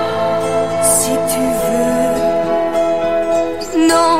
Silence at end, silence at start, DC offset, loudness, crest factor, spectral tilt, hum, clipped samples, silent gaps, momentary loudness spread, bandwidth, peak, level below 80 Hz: 0 s; 0 s; 2%; -15 LUFS; 14 dB; -3.5 dB/octave; none; under 0.1%; none; 5 LU; 16 kHz; 0 dBFS; -42 dBFS